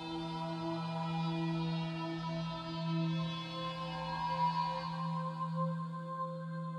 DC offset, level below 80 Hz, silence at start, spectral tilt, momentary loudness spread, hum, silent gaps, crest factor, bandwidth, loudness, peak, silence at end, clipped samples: under 0.1%; -64 dBFS; 0 s; -7 dB/octave; 6 LU; none; none; 14 dB; 8.4 kHz; -38 LUFS; -24 dBFS; 0 s; under 0.1%